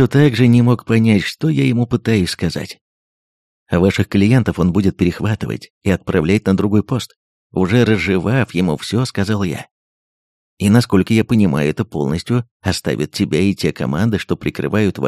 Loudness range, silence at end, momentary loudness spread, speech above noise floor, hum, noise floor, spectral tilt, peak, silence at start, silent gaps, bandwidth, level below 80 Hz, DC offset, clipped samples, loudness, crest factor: 2 LU; 0 s; 8 LU; over 75 dB; none; under -90 dBFS; -7 dB/octave; 0 dBFS; 0 s; 2.81-3.66 s, 5.70-5.81 s, 7.16-7.50 s, 9.71-10.57 s, 12.51-12.60 s; 14 kHz; -42 dBFS; under 0.1%; under 0.1%; -16 LUFS; 16 dB